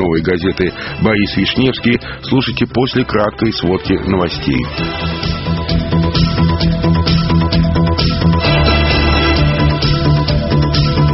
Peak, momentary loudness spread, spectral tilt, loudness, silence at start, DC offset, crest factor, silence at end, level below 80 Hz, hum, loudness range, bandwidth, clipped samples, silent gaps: 0 dBFS; 6 LU; -5 dB/octave; -14 LUFS; 0 s; under 0.1%; 14 dB; 0 s; -22 dBFS; none; 3 LU; 6 kHz; under 0.1%; none